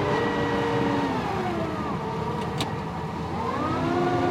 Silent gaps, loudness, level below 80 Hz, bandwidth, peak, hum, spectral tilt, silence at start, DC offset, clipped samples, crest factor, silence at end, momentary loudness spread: none; -27 LUFS; -48 dBFS; 16.5 kHz; -12 dBFS; none; -6.5 dB/octave; 0 s; under 0.1%; under 0.1%; 14 dB; 0 s; 5 LU